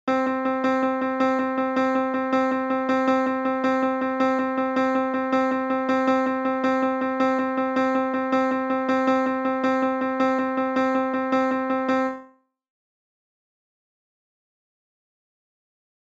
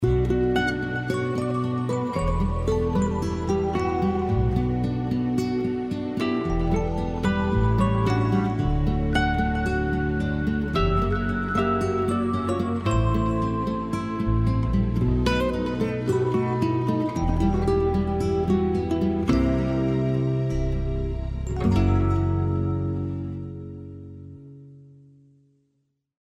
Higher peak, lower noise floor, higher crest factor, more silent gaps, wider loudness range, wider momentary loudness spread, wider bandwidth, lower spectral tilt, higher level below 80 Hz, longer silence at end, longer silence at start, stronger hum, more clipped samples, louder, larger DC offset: about the same, -8 dBFS vs -8 dBFS; second, -52 dBFS vs -73 dBFS; about the same, 14 dB vs 16 dB; neither; about the same, 4 LU vs 2 LU; second, 2 LU vs 6 LU; second, 7.6 kHz vs 12 kHz; second, -5.5 dB/octave vs -8 dB/octave; second, -68 dBFS vs -32 dBFS; first, 3.75 s vs 1.35 s; about the same, 0.05 s vs 0 s; neither; neither; about the same, -23 LUFS vs -24 LUFS; neither